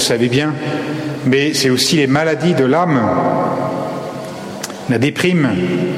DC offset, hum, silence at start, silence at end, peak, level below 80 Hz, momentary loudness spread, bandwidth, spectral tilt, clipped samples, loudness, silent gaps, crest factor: under 0.1%; none; 0 s; 0 s; -2 dBFS; -54 dBFS; 12 LU; 16 kHz; -5 dB/octave; under 0.1%; -15 LUFS; none; 14 dB